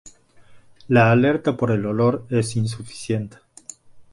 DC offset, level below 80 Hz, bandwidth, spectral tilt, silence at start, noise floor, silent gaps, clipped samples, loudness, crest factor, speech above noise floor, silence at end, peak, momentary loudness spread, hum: under 0.1%; -54 dBFS; 11.5 kHz; -6.5 dB/octave; 0.05 s; -48 dBFS; none; under 0.1%; -20 LUFS; 20 dB; 28 dB; 0.1 s; 0 dBFS; 24 LU; none